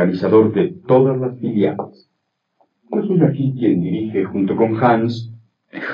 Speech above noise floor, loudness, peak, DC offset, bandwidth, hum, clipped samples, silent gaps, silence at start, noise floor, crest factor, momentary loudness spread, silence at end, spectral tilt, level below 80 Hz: 56 dB; -17 LUFS; -2 dBFS; under 0.1%; 6.6 kHz; none; under 0.1%; none; 0 s; -72 dBFS; 16 dB; 15 LU; 0 s; -10 dB/octave; -72 dBFS